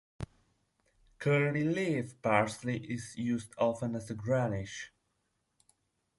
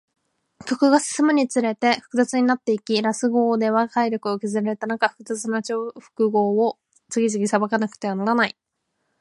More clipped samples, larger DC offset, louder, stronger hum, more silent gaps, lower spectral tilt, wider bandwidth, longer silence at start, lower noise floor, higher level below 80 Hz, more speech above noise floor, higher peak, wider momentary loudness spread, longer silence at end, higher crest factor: neither; neither; second, -33 LUFS vs -22 LUFS; neither; neither; first, -6.5 dB/octave vs -4.5 dB/octave; about the same, 11.5 kHz vs 11.5 kHz; second, 0.2 s vs 0.65 s; first, -80 dBFS vs -74 dBFS; first, -62 dBFS vs -74 dBFS; second, 47 dB vs 53 dB; second, -12 dBFS vs -4 dBFS; first, 15 LU vs 7 LU; first, 1.3 s vs 0.7 s; about the same, 22 dB vs 18 dB